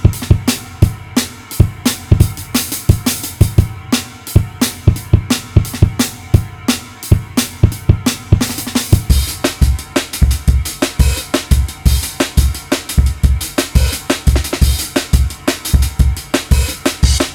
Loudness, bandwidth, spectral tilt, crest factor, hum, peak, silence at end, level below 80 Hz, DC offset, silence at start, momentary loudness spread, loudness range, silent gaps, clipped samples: -15 LUFS; over 20 kHz; -5 dB/octave; 14 dB; none; 0 dBFS; 0 s; -18 dBFS; under 0.1%; 0 s; 5 LU; 1 LU; none; 0.9%